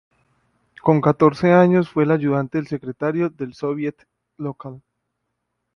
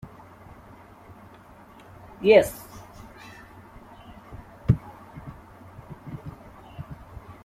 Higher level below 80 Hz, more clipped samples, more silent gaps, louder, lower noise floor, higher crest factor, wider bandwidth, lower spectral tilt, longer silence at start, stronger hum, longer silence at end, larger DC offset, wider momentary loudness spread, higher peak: second, -58 dBFS vs -48 dBFS; neither; neither; first, -19 LUFS vs -22 LUFS; first, -76 dBFS vs -49 dBFS; second, 20 dB vs 26 dB; second, 6.6 kHz vs 15.5 kHz; first, -9 dB/octave vs -6.5 dB/octave; first, 0.85 s vs 0.05 s; first, 60 Hz at -60 dBFS vs none; first, 0.95 s vs 0.1 s; neither; second, 16 LU vs 26 LU; first, 0 dBFS vs -4 dBFS